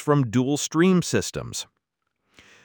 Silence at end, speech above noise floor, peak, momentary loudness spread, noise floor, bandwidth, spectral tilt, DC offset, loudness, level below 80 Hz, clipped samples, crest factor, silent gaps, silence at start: 1 s; 56 dB; -8 dBFS; 13 LU; -78 dBFS; 20 kHz; -5 dB/octave; under 0.1%; -23 LUFS; -56 dBFS; under 0.1%; 16 dB; none; 0 s